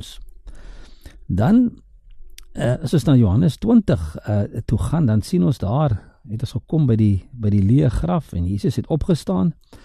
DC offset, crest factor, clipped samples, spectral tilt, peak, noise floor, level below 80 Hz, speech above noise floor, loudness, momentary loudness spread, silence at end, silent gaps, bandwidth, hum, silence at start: under 0.1%; 16 dB; under 0.1%; -8.5 dB/octave; -4 dBFS; -40 dBFS; -36 dBFS; 22 dB; -19 LUFS; 9 LU; 0.1 s; none; 13 kHz; none; 0 s